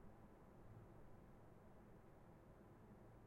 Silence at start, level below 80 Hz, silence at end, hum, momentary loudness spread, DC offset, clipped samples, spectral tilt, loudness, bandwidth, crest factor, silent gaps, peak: 0 s; -72 dBFS; 0 s; none; 2 LU; under 0.1%; under 0.1%; -8 dB/octave; -66 LUFS; 16 kHz; 14 dB; none; -50 dBFS